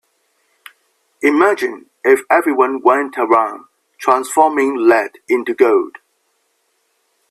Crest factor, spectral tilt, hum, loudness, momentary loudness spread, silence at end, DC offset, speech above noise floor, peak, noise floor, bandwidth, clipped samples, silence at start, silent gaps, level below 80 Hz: 16 dB; -3.5 dB/octave; none; -15 LUFS; 8 LU; 1.4 s; under 0.1%; 51 dB; 0 dBFS; -65 dBFS; 13.5 kHz; under 0.1%; 1.2 s; none; -66 dBFS